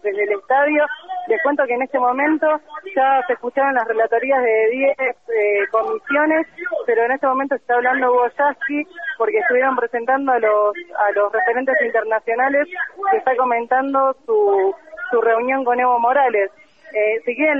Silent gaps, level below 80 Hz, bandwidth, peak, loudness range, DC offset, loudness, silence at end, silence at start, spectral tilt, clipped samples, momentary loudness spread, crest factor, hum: none; -68 dBFS; 3.8 kHz; -4 dBFS; 1 LU; 0.2%; -18 LUFS; 0 s; 0.05 s; -6 dB/octave; under 0.1%; 6 LU; 12 dB; none